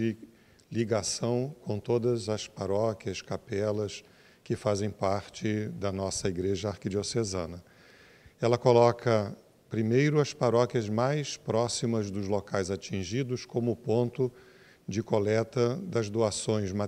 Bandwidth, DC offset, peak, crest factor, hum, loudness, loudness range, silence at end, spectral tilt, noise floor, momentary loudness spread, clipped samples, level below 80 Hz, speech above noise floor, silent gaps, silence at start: 13 kHz; under 0.1%; -8 dBFS; 22 dB; none; -30 LUFS; 5 LU; 0 s; -5.5 dB/octave; -56 dBFS; 10 LU; under 0.1%; -62 dBFS; 27 dB; none; 0 s